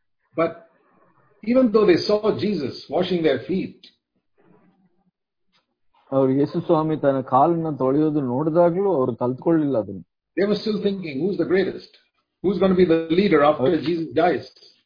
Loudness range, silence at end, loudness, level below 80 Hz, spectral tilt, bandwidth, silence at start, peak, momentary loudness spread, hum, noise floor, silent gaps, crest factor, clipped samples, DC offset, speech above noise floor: 7 LU; 0.35 s; -21 LUFS; -56 dBFS; -8.5 dB/octave; 5.2 kHz; 0.35 s; -4 dBFS; 10 LU; none; -71 dBFS; none; 18 dB; under 0.1%; under 0.1%; 51 dB